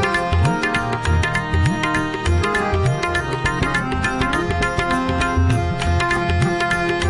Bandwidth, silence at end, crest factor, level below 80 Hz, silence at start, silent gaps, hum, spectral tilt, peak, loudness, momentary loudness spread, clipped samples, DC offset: 11.5 kHz; 0 s; 12 dB; -32 dBFS; 0 s; none; none; -5.5 dB/octave; -6 dBFS; -19 LUFS; 2 LU; under 0.1%; under 0.1%